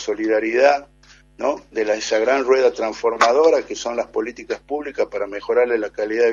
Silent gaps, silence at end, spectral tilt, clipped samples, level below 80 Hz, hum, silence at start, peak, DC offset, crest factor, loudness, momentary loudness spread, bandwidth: none; 0 s; -2.5 dB/octave; under 0.1%; -54 dBFS; none; 0 s; 0 dBFS; under 0.1%; 20 dB; -20 LUFS; 10 LU; 7.6 kHz